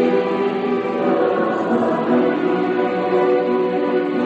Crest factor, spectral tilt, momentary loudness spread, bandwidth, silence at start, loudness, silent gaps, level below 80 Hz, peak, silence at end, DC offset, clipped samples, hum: 12 dB; -8 dB/octave; 3 LU; 7.8 kHz; 0 s; -18 LUFS; none; -62 dBFS; -4 dBFS; 0 s; under 0.1%; under 0.1%; none